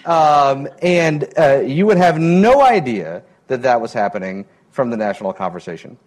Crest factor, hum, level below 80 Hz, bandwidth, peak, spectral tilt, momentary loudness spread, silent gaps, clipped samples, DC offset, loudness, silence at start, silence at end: 12 dB; none; -52 dBFS; 12 kHz; -4 dBFS; -6.5 dB/octave; 17 LU; none; under 0.1%; under 0.1%; -15 LUFS; 0.05 s; 0.15 s